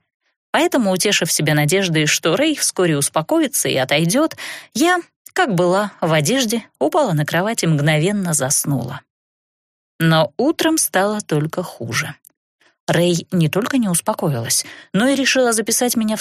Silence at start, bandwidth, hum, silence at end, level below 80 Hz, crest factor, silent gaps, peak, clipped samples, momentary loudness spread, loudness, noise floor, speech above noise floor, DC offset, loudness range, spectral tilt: 0.55 s; 15.5 kHz; none; 0 s; -60 dBFS; 16 dB; 5.16-5.25 s, 9.10-9.99 s, 12.37-12.59 s, 12.80-12.87 s; -2 dBFS; under 0.1%; 7 LU; -17 LUFS; under -90 dBFS; over 73 dB; under 0.1%; 3 LU; -4 dB/octave